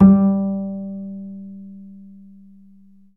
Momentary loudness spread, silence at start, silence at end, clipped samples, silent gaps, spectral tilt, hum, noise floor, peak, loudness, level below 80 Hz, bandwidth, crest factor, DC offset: 25 LU; 0 s; 1.2 s; under 0.1%; none; -14.5 dB/octave; none; -50 dBFS; 0 dBFS; -20 LUFS; -48 dBFS; 1.9 kHz; 20 dB; 0.3%